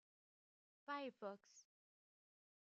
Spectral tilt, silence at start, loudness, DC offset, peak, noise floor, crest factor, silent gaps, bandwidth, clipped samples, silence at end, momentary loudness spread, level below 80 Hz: -2 dB/octave; 0.9 s; -52 LUFS; under 0.1%; -36 dBFS; under -90 dBFS; 20 dB; none; 7.4 kHz; under 0.1%; 1 s; 19 LU; under -90 dBFS